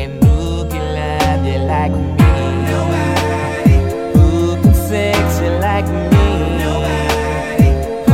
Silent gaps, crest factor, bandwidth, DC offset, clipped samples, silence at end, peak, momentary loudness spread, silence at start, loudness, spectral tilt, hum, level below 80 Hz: none; 14 dB; 16 kHz; under 0.1%; under 0.1%; 0 s; 0 dBFS; 5 LU; 0 s; -14 LUFS; -6.5 dB/octave; none; -20 dBFS